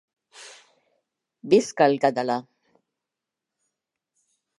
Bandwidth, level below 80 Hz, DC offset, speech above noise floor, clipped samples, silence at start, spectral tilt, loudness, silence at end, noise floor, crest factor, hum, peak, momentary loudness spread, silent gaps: 11.5 kHz; -76 dBFS; under 0.1%; 66 dB; under 0.1%; 0.4 s; -5 dB/octave; -22 LUFS; 2.2 s; -86 dBFS; 22 dB; none; -4 dBFS; 25 LU; none